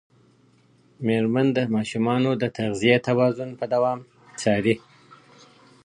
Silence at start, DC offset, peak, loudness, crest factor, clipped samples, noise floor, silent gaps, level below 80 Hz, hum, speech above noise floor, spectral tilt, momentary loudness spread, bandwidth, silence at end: 1 s; under 0.1%; -4 dBFS; -23 LUFS; 20 dB; under 0.1%; -58 dBFS; none; -62 dBFS; none; 36 dB; -6 dB/octave; 9 LU; 11 kHz; 1.1 s